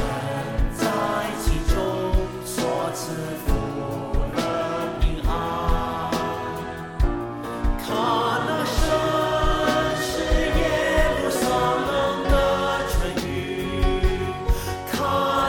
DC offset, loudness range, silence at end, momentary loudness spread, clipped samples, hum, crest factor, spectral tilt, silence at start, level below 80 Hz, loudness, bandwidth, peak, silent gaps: under 0.1%; 4 LU; 0 s; 7 LU; under 0.1%; none; 14 dB; -5 dB/octave; 0 s; -28 dBFS; -24 LUFS; 17.5 kHz; -8 dBFS; none